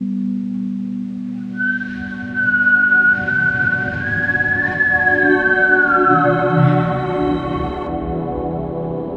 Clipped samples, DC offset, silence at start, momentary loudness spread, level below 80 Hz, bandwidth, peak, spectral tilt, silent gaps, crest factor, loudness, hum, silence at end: under 0.1%; under 0.1%; 0 s; 11 LU; -40 dBFS; 7 kHz; 0 dBFS; -8.5 dB/octave; none; 16 dB; -16 LUFS; none; 0 s